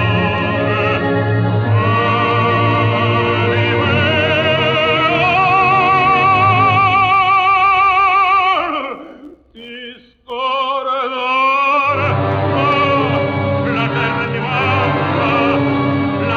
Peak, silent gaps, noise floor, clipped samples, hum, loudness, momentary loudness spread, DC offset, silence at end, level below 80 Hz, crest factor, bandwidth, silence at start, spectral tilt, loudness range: -2 dBFS; none; -38 dBFS; under 0.1%; none; -14 LUFS; 7 LU; under 0.1%; 0 s; -44 dBFS; 14 dB; 6.8 kHz; 0 s; -7.5 dB/octave; 6 LU